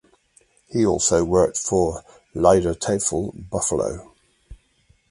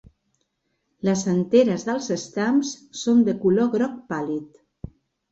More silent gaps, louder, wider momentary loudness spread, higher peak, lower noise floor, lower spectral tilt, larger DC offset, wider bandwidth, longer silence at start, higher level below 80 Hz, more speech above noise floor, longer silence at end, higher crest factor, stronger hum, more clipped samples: neither; about the same, -21 LUFS vs -22 LUFS; about the same, 11 LU vs 13 LU; first, 0 dBFS vs -6 dBFS; second, -61 dBFS vs -74 dBFS; about the same, -5 dB/octave vs -6 dB/octave; neither; first, 11.5 kHz vs 8 kHz; second, 0.7 s vs 1.05 s; first, -42 dBFS vs -58 dBFS; second, 40 dB vs 52 dB; second, 0.55 s vs 0.85 s; about the same, 22 dB vs 18 dB; neither; neither